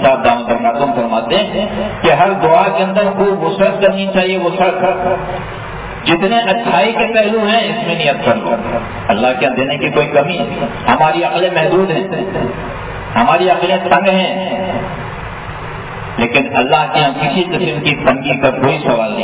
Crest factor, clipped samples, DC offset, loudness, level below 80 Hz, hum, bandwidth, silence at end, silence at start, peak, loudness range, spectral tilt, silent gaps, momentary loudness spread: 14 dB; under 0.1%; under 0.1%; -13 LUFS; -38 dBFS; none; 4 kHz; 0 s; 0 s; 0 dBFS; 2 LU; -9.5 dB/octave; none; 10 LU